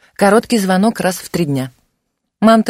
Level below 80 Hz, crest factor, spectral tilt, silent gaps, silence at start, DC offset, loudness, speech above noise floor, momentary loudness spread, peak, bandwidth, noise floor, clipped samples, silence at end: -52 dBFS; 14 dB; -5.5 dB/octave; none; 0.2 s; under 0.1%; -15 LUFS; 58 dB; 8 LU; 0 dBFS; 16 kHz; -71 dBFS; under 0.1%; 0 s